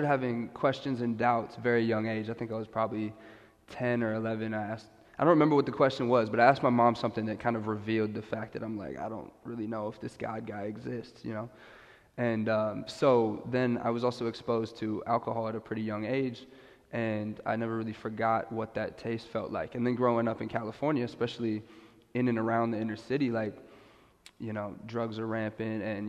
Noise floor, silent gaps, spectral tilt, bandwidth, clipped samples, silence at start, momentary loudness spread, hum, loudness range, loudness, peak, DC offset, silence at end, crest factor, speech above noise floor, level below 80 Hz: -59 dBFS; none; -7.5 dB/octave; 10 kHz; under 0.1%; 0 s; 13 LU; none; 8 LU; -31 LUFS; -8 dBFS; under 0.1%; 0 s; 24 dB; 28 dB; -66 dBFS